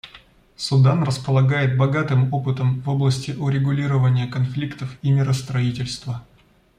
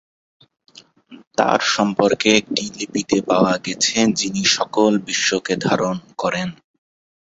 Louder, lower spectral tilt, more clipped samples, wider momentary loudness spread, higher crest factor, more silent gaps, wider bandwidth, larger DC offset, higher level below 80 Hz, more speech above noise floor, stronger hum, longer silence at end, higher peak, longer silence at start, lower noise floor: second, -21 LUFS vs -18 LUFS; first, -7 dB/octave vs -3.5 dB/octave; neither; about the same, 10 LU vs 8 LU; about the same, 16 dB vs 18 dB; second, none vs 1.27-1.31 s; first, 10.5 kHz vs 8.2 kHz; neither; first, -52 dBFS vs -58 dBFS; first, 30 dB vs 26 dB; neither; second, 0.55 s vs 0.85 s; about the same, -4 dBFS vs -2 dBFS; second, 0.05 s vs 1.1 s; first, -49 dBFS vs -45 dBFS